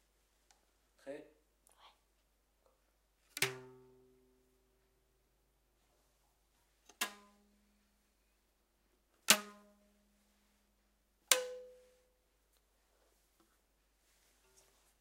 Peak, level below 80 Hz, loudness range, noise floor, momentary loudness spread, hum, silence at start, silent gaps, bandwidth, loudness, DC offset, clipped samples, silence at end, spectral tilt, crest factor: -2 dBFS; -80 dBFS; 14 LU; -77 dBFS; 24 LU; none; 1.05 s; none; 16 kHz; -34 LUFS; under 0.1%; under 0.1%; 3.3 s; 0 dB/octave; 44 dB